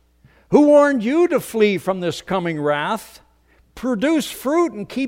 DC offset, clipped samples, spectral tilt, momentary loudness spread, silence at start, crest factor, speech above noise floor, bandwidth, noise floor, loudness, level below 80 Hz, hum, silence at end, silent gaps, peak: under 0.1%; under 0.1%; -5.5 dB/octave; 11 LU; 0.5 s; 18 dB; 38 dB; 16.5 kHz; -56 dBFS; -18 LUFS; -54 dBFS; none; 0 s; none; 0 dBFS